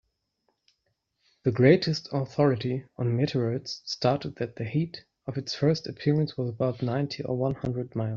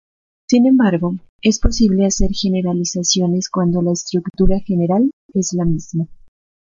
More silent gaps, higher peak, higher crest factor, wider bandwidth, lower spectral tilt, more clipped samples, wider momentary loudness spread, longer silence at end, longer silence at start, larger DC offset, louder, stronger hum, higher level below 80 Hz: second, none vs 1.29-1.39 s, 5.13-5.29 s; second, -6 dBFS vs -2 dBFS; first, 22 dB vs 14 dB; about the same, 7.4 kHz vs 7.6 kHz; about the same, -6.5 dB/octave vs -5.5 dB/octave; neither; first, 11 LU vs 8 LU; second, 0 s vs 0.6 s; first, 1.45 s vs 0.5 s; neither; second, -28 LUFS vs -17 LUFS; neither; second, -62 dBFS vs -28 dBFS